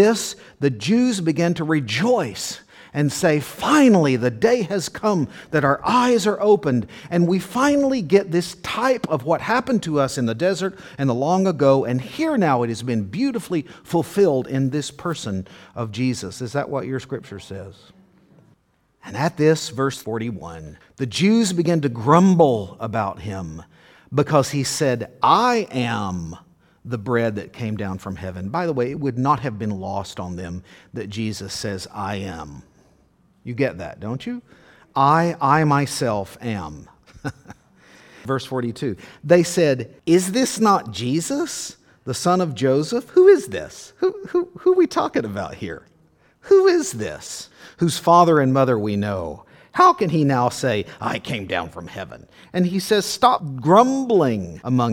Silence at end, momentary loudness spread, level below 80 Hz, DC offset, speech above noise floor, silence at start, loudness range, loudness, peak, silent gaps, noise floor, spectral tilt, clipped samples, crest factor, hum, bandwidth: 0 s; 16 LU; -54 dBFS; under 0.1%; 42 dB; 0 s; 8 LU; -20 LUFS; 0 dBFS; none; -62 dBFS; -5.5 dB/octave; under 0.1%; 20 dB; none; 18 kHz